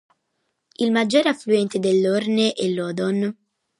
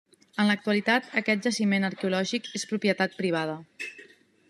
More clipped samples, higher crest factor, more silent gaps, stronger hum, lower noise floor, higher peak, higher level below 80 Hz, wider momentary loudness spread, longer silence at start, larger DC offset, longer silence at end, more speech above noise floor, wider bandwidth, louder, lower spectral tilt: neither; about the same, 16 dB vs 20 dB; neither; neither; first, -74 dBFS vs -54 dBFS; about the same, -6 dBFS vs -8 dBFS; first, -72 dBFS vs -78 dBFS; second, 6 LU vs 13 LU; first, 0.8 s vs 0.35 s; neither; about the same, 0.5 s vs 0.45 s; first, 54 dB vs 27 dB; about the same, 11.5 kHz vs 12.5 kHz; first, -21 LUFS vs -27 LUFS; about the same, -5.5 dB/octave vs -4.5 dB/octave